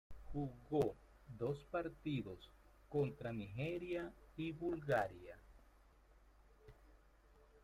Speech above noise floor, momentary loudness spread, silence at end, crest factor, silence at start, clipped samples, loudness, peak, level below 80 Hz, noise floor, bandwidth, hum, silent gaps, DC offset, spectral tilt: 25 dB; 18 LU; 0.05 s; 20 dB; 0.1 s; under 0.1%; -44 LUFS; -26 dBFS; -64 dBFS; -68 dBFS; 15.5 kHz; none; none; under 0.1%; -7.5 dB/octave